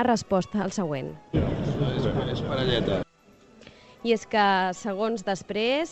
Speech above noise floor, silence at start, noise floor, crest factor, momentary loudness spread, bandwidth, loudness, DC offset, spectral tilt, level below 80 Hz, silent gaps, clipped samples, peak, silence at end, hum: 31 dB; 0 s; -56 dBFS; 16 dB; 8 LU; 8.6 kHz; -26 LUFS; under 0.1%; -5.5 dB/octave; -44 dBFS; none; under 0.1%; -10 dBFS; 0 s; none